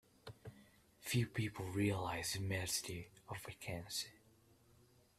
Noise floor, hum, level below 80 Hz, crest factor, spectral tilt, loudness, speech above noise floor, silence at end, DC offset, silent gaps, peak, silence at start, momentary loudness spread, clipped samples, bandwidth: -70 dBFS; none; -68 dBFS; 20 dB; -4 dB/octave; -42 LUFS; 28 dB; 1 s; under 0.1%; none; -24 dBFS; 0.25 s; 18 LU; under 0.1%; 15.5 kHz